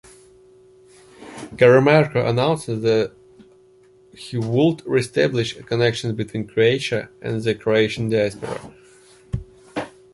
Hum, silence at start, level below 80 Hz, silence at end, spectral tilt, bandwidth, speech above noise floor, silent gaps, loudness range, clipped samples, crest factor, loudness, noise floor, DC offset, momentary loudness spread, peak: none; 1.2 s; -50 dBFS; 0.25 s; -6 dB/octave; 11.5 kHz; 33 dB; none; 3 LU; under 0.1%; 20 dB; -20 LUFS; -52 dBFS; under 0.1%; 17 LU; -2 dBFS